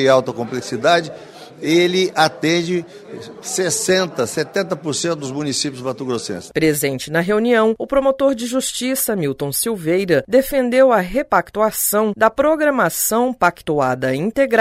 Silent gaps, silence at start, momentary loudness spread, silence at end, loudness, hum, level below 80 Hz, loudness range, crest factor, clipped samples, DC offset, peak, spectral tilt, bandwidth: none; 0 s; 9 LU; 0 s; -18 LUFS; none; -48 dBFS; 4 LU; 16 dB; under 0.1%; under 0.1%; 0 dBFS; -4 dB/octave; 16 kHz